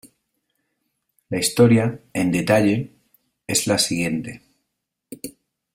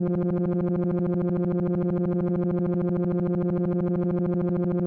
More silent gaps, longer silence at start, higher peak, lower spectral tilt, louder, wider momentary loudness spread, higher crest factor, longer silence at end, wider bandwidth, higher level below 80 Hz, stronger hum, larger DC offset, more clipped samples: neither; about the same, 0.05 s vs 0 s; first, -2 dBFS vs -18 dBFS; second, -4.5 dB/octave vs -13 dB/octave; first, -20 LUFS vs -25 LUFS; first, 21 LU vs 0 LU; first, 20 dB vs 6 dB; first, 0.45 s vs 0 s; first, 16 kHz vs 2.8 kHz; second, -56 dBFS vs -50 dBFS; neither; second, under 0.1% vs 0.1%; neither